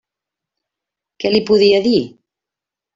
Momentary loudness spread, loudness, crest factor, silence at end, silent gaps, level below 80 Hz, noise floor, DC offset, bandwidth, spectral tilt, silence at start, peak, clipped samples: 11 LU; -14 LUFS; 16 dB; 0.9 s; none; -56 dBFS; -86 dBFS; under 0.1%; 7.6 kHz; -6 dB/octave; 1.2 s; -2 dBFS; under 0.1%